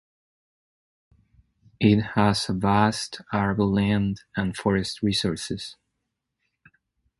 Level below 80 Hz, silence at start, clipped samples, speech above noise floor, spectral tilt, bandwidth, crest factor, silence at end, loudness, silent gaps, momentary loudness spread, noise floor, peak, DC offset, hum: -48 dBFS; 1.8 s; under 0.1%; 57 dB; -5.5 dB/octave; 11.5 kHz; 22 dB; 1.45 s; -24 LUFS; none; 10 LU; -80 dBFS; -4 dBFS; under 0.1%; none